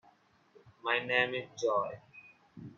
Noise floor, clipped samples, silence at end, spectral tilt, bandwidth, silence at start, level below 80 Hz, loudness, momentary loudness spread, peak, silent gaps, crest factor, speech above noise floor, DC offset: -66 dBFS; under 0.1%; 0.05 s; -3.5 dB/octave; 7.6 kHz; 0.65 s; -78 dBFS; -32 LUFS; 21 LU; -12 dBFS; none; 24 dB; 34 dB; under 0.1%